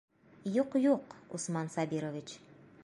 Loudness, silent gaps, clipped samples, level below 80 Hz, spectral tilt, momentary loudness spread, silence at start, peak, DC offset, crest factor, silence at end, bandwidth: -34 LUFS; none; under 0.1%; -78 dBFS; -6 dB/octave; 15 LU; 0.45 s; -16 dBFS; under 0.1%; 18 dB; 0.45 s; 11.5 kHz